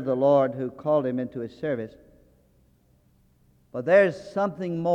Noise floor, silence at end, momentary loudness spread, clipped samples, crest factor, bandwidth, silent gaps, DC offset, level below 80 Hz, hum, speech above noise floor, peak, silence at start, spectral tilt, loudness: -62 dBFS; 0 s; 13 LU; under 0.1%; 18 dB; 8 kHz; none; under 0.1%; -64 dBFS; none; 38 dB; -6 dBFS; 0 s; -8 dB/octave; -25 LUFS